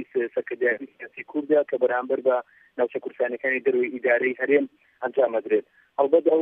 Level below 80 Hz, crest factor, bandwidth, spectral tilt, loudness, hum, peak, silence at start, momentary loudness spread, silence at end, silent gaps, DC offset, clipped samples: -84 dBFS; 18 dB; 3.7 kHz; -8 dB/octave; -24 LUFS; none; -6 dBFS; 0 s; 10 LU; 0 s; none; under 0.1%; under 0.1%